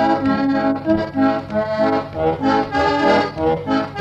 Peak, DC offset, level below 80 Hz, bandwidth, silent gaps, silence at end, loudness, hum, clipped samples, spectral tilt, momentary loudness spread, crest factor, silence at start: -4 dBFS; under 0.1%; -44 dBFS; 8 kHz; none; 0 s; -18 LUFS; none; under 0.1%; -7 dB/octave; 4 LU; 14 dB; 0 s